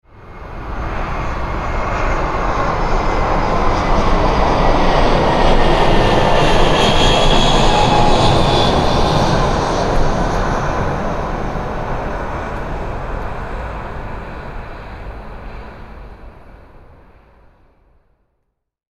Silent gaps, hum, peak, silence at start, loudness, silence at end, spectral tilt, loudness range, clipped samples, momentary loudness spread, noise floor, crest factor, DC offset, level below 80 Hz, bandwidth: none; none; 0 dBFS; 0.15 s; -16 LUFS; 2.45 s; -5 dB/octave; 17 LU; under 0.1%; 19 LU; -70 dBFS; 14 dB; under 0.1%; -20 dBFS; 11 kHz